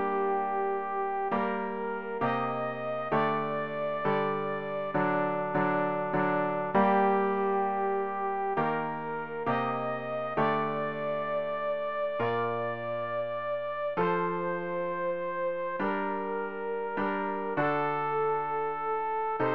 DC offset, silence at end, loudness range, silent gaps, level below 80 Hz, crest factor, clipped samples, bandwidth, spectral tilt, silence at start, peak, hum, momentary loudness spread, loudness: 0.4%; 0 s; 4 LU; none; -68 dBFS; 16 dB; under 0.1%; 5.6 kHz; -9 dB/octave; 0 s; -14 dBFS; none; 5 LU; -30 LUFS